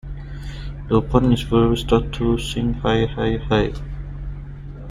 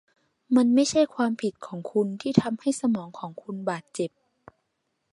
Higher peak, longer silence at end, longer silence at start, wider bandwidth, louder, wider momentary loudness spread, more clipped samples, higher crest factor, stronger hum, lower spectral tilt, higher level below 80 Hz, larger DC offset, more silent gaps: about the same, -2 dBFS vs -2 dBFS; second, 0 s vs 1.05 s; second, 0.05 s vs 0.5 s; first, 14.5 kHz vs 11.5 kHz; first, -20 LUFS vs -26 LUFS; about the same, 16 LU vs 14 LU; neither; second, 18 dB vs 24 dB; neither; first, -7 dB/octave vs -5.5 dB/octave; first, -30 dBFS vs -68 dBFS; neither; neither